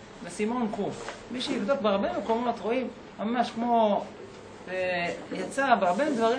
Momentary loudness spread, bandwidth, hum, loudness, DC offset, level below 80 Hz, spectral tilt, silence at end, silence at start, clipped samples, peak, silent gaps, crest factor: 14 LU; 10.5 kHz; none; -28 LUFS; under 0.1%; -62 dBFS; -5 dB/octave; 0 s; 0 s; under 0.1%; -8 dBFS; none; 20 dB